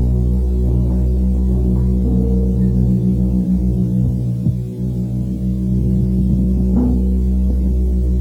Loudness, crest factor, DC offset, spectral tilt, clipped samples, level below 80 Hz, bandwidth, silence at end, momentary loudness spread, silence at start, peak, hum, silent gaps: -17 LUFS; 10 dB; under 0.1%; -11 dB/octave; under 0.1%; -18 dBFS; 1.2 kHz; 0 s; 5 LU; 0 s; -4 dBFS; none; none